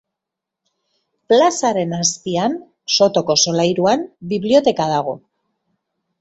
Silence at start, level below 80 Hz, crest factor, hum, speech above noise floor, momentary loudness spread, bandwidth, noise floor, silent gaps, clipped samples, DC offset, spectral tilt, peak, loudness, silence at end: 1.3 s; -60 dBFS; 18 dB; none; 67 dB; 9 LU; 8.2 kHz; -83 dBFS; none; under 0.1%; under 0.1%; -3.5 dB/octave; -2 dBFS; -17 LUFS; 1.05 s